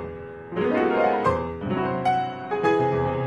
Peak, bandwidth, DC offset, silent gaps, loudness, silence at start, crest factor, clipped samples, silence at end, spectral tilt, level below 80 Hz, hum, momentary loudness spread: -8 dBFS; 10 kHz; under 0.1%; none; -24 LUFS; 0 s; 16 dB; under 0.1%; 0 s; -7.5 dB/octave; -48 dBFS; none; 8 LU